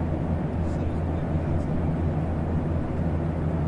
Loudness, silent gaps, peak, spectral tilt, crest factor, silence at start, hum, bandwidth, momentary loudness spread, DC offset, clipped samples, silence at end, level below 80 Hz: -27 LUFS; none; -14 dBFS; -10 dB/octave; 12 dB; 0 s; none; 5.4 kHz; 1 LU; under 0.1%; under 0.1%; 0 s; -36 dBFS